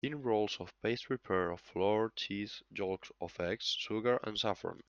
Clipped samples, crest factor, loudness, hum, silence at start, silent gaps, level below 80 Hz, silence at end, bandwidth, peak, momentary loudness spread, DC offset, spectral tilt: under 0.1%; 18 dB; -36 LUFS; none; 0.05 s; none; -70 dBFS; 0.05 s; 7.4 kHz; -18 dBFS; 7 LU; under 0.1%; -5 dB/octave